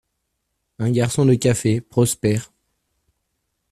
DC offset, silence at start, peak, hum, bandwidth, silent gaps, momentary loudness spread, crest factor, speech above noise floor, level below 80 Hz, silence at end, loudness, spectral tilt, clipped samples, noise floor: under 0.1%; 0.8 s; -4 dBFS; none; 13.5 kHz; none; 6 LU; 18 dB; 57 dB; -52 dBFS; 1.25 s; -19 LUFS; -6 dB/octave; under 0.1%; -75 dBFS